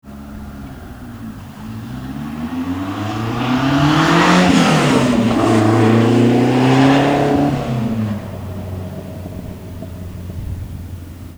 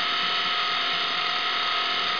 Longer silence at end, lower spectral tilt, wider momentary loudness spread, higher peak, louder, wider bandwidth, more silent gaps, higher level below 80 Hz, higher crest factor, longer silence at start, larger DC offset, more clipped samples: about the same, 0 s vs 0 s; first, -6 dB/octave vs -1 dB/octave; first, 20 LU vs 1 LU; first, 0 dBFS vs -14 dBFS; first, -14 LUFS vs -23 LUFS; first, over 20 kHz vs 5.4 kHz; neither; first, -38 dBFS vs -70 dBFS; about the same, 16 dB vs 12 dB; about the same, 0.05 s vs 0 s; second, 0.1% vs 0.4%; neither